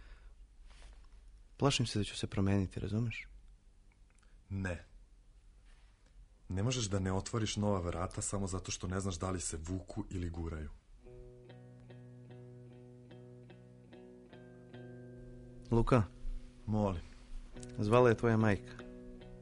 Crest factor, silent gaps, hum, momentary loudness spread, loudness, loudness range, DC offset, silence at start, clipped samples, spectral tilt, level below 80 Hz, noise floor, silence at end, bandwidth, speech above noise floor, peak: 24 dB; none; 50 Hz at -65 dBFS; 25 LU; -35 LUFS; 20 LU; under 0.1%; 0 s; under 0.1%; -5.5 dB/octave; -50 dBFS; -62 dBFS; 0 s; 10.5 kHz; 28 dB; -14 dBFS